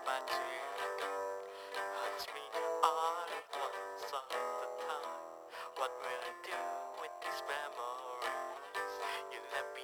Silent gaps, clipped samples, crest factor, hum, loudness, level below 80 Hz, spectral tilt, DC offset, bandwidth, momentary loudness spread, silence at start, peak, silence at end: none; under 0.1%; 26 dB; none; -40 LUFS; -84 dBFS; -0.5 dB/octave; under 0.1%; over 20 kHz; 6 LU; 0 s; -14 dBFS; 0 s